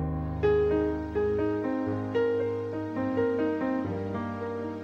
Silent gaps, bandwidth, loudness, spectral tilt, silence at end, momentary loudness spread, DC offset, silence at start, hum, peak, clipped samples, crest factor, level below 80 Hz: none; 7 kHz; -29 LUFS; -9 dB/octave; 0 s; 8 LU; under 0.1%; 0 s; none; -14 dBFS; under 0.1%; 14 dB; -46 dBFS